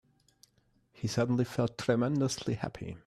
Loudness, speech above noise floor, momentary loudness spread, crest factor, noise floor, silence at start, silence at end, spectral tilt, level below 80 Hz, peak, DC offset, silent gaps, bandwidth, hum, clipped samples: -32 LUFS; 39 dB; 8 LU; 18 dB; -71 dBFS; 1 s; 0.1 s; -6 dB/octave; -62 dBFS; -14 dBFS; under 0.1%; none; 14 kHz; none; under 0.1%